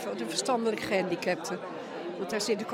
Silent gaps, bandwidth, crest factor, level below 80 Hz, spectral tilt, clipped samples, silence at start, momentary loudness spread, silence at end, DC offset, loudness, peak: none; 16 kHz; 18 dB; -70 dBFS; -3.5 dB/octave; under 0.1%; 0 s; 9 LU; 0 s; under 0.1%; -31 LUFS; -14 dBFS